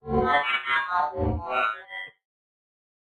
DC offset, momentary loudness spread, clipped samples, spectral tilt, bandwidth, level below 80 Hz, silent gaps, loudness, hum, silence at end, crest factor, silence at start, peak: under 0.1%; 15 LU; under 0.1%; -6.5 dB/octave; 9.6 kHz; -44 dBFS; none; -25 LUFS; none; 0.95 s; 18 dB; 0.05 s; -10 dBFS